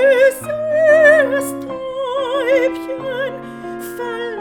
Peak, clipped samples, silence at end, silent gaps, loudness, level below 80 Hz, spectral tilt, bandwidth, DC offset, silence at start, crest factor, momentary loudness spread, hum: -2 dBFS; under 0.1%; 0 s; none; -16 LUFS; -56 dBFS; -4 dB/octave; 18.5 kHz; under 0.1%; 0 s; 14 dB; 16 LU; none